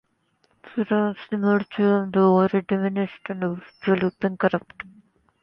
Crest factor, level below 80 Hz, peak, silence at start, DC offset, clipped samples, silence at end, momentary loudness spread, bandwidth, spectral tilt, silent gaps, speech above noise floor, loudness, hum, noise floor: 16 dB; -64 dBFS; -6 dBFS; 0.65 s; under 0.1%; under 0.1%; 0.55 s; 11 LU; 5.6 kHz; -10 dB/octave; none; 45 dB; -23 LUFS; none; -67 dBFS